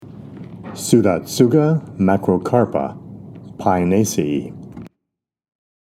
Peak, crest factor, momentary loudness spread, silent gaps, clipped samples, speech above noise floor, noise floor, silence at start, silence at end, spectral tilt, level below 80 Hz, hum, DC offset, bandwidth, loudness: 0 dBFS; 18 dB; 22 LU; none; under 0.1%; 65 dB; -81 dBFS; 0 s; 1 s; -6.5 dB/octave; -54 dBFS; none; under 0.1%; 15.5 kHz; -18 LUFS